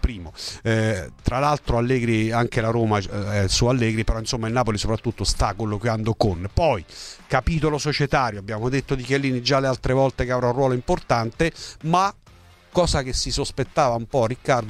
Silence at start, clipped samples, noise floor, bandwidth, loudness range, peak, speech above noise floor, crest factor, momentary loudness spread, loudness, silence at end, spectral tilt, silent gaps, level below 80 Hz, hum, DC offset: 0.05 s; under 0.1%; -50 dBFS; 13 kHz; 2 LU; -2 dBFS; 28 dB; 20 dB; 5 LU; -22 LUFS; 0 s; -5 dB/octave; none; -34 dBFS; none; under 0.1%